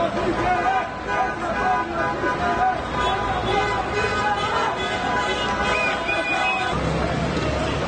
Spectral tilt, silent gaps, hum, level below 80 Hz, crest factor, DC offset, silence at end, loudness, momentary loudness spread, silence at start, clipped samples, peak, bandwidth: -5 dB/octave; none; none; -38 dBFS; 14 dB; under 0.1%; 0 s; -22 LUFS; 3 LU; 0 s; under 0.1%; -8 dBFS; 9.6 kHz